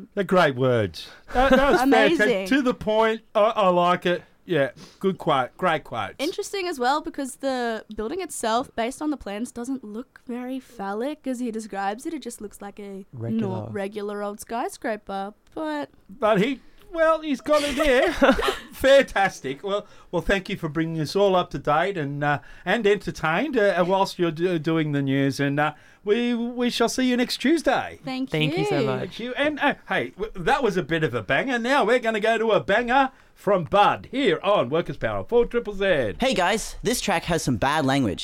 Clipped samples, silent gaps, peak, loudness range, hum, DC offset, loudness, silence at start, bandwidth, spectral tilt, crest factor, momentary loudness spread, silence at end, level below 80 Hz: under 0.1%; none; -4 dBFS; 10 LU; none; under 0.1%; -23 LUFS; 0 s; 16.5 kHz; -5 dB/octave; 20 dB; 12 LU; 0 s; -46 dBFS